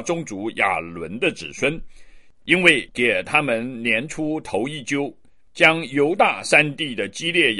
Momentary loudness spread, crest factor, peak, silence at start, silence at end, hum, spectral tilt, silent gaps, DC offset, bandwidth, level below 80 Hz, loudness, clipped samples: 11 LU; 22 dB; 0 dBFS; 0 s; 0 s; none; -4 dB/octave; none; 0.4%; 11.5 kHz; -52 dBFS; -20 LUFS; under 0.1%